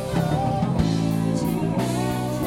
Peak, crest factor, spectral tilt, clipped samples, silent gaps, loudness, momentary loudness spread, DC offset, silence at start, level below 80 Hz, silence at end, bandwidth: -6 dBFS; 16 dB; -7 dB/octave; under 0.1%; none; -23 LUFS; 2 LU; under 0.1%; 0 s; -40 dBFS; 0 s; 16.5 kHz